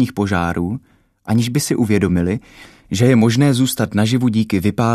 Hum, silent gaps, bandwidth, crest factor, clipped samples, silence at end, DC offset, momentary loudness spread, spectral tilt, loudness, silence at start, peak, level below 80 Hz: none; none; 14 kHz; 14 dB; under 0.1%; 0 s; under 0.1%; 11 LU; -6 dB/octave; -17 LUFS; 0 s; -2 dBFS; -44 dBFS